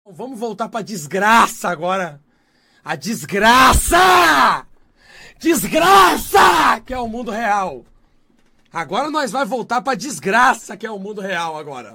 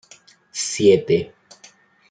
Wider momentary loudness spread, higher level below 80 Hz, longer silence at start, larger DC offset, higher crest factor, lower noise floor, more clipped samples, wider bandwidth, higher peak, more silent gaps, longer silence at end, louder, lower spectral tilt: about the same, 17 LU vs 17 LU; first, -36 dBFS vs -62 dBFS; second, 0.15 s vs 0.55 s; neither; about the same, 16 dB vs 18 dB; first, -58 dBFS vs -51 dBFS; neither; first, 17 kHz vs 9.4 kHz; first, 0 dBFS vs -4 dBFS; neither; second, 0.05 s vs 0.8 s; first, -15 LUFS vs -18 LUFS; second, -3 dB/octave vs -4.5 dB/octave